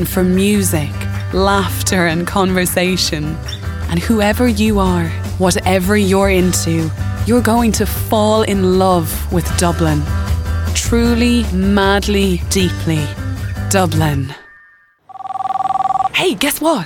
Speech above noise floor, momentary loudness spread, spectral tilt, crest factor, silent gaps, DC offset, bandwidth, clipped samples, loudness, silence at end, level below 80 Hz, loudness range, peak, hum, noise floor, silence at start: 35 dB; 8 LU; -5 dB/octave; 14 dB; none; under 0.1%; 19 kHz; under 0.1%; -15 LUFS; 0 s; -28 dBFS; 3 LU; -2 dBFS; none; -48 dBFS; 0 s